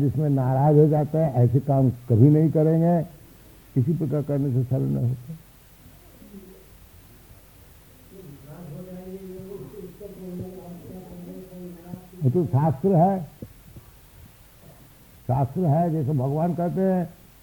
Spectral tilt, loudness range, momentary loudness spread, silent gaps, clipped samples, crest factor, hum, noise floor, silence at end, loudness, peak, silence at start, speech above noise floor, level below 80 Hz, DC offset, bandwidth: -10.5 dB/octave; 21 LU; 22 LU; none; under 0.1%; 20 dB; none; -50 dBFS; 0.3 s; -22 LUFS; -4 dBFS; 0 s; 29 dB; -54 dBFS; under 0.1%; 19.5 kHz